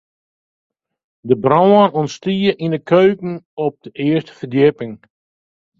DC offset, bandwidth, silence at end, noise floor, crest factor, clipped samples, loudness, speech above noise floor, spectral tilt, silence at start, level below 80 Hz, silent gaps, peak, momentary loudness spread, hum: under 0.1%; 7.4 kHz; 0.85 s; under -90 dBFS; 18 dB; under 0.1%; -16 LUFS; over 75 dB; -7.5 dB/octave; 1.25 s; -58 dBFS; 3.45-3.57 s; 0 dBFS; 14 LU; none